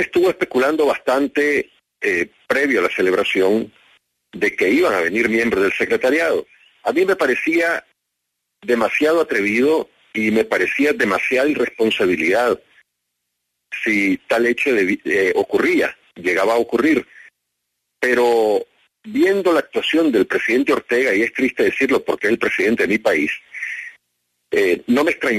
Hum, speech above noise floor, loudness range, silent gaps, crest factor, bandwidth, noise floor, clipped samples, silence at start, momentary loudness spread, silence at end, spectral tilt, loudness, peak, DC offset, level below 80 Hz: 60 Hz at -55 dBFS; 59 dB; 2 LU; none; 14 dB; 13.5 kHz; -77 dBFS; under 0.1%; 0 s; 7 LU; 0 s; -4.5 dB/octave; -18 LUFS; -4 dBFS; under 0.1%; -58 dBFS